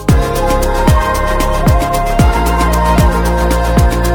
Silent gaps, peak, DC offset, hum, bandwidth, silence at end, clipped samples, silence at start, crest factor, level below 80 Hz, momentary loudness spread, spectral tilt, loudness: none; 0 dBFS; under 0.1%; none; 18.5 kHz; 0 s; under 0.1%; 0 s; 10 dB; -14 dBFS; 3 LU; -6 dB/octave; -12 LUFS